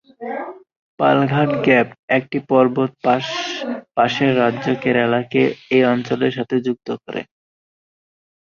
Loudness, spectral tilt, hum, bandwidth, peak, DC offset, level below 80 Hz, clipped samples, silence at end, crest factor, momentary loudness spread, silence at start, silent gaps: -18 LUFS; -6.5 dB/octave; none; 7.2 kHz; -2 dBFS; under 0.1%; -60 dBFS; under 0.1%; 1.25 s; 18 dB; 12 LU; 0.2 s; 0.77-0.97 s, 1.99-2.08 s